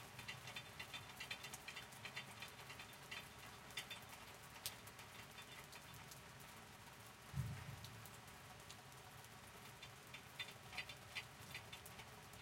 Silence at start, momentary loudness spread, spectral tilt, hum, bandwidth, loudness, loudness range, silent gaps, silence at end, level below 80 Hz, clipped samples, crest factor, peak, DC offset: 0 s; 8 LU; -3 dB/octave; none; 16.5 kHz; -54 LUFS; 3 LU; none; 0 s; -72 dBFS; under 0.1%; 30 dB; -26 dBFS; under 0.1%